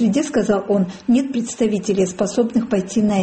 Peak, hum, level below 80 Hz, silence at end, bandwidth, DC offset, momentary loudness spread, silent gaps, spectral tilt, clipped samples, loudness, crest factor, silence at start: -6 dBFS; none; -52 dBFS; 0 s; 8.8 kHz; under 0.1%; 2 LU; none; -6 dB/octave; under 0.1%; -19 LUFS; 12 dB; 0 s